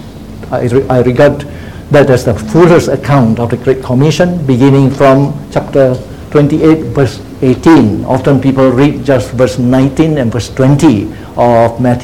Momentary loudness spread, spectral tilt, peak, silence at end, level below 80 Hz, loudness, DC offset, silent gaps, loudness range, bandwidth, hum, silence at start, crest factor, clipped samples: 8 LU; -7.5 dB/octave; 0 dBFS; 0 s; -32 dBFS; -9 LUFS; 0.9%; none; 1 LU; 15 kHz; none; 0 s; 8 dB; 1%